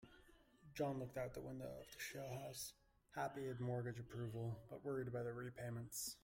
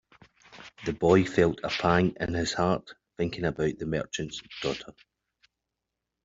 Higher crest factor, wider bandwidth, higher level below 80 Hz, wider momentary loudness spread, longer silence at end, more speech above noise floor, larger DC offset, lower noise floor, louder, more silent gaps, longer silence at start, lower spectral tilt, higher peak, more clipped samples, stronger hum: about the same, 18 dB vs 22 dB; first, 16.5 kHz vs 7.8 kHz; second, -72 dBFS vs -54 dBFS; second, 7 LU vs 15 LU; second, 0.05 s vs 1.35 s; second, 22 dB vs 58 dB; neither; second, -69 dBFS vs -85 dBFS; second, -49 LUFS vs -28 LUFS; neither; second, 0 s vs 0.5 s; about the same, -5 dB/octave vs -5.5 dB/octave; second, -32 dBFS vs -8 dBFS; neither; neither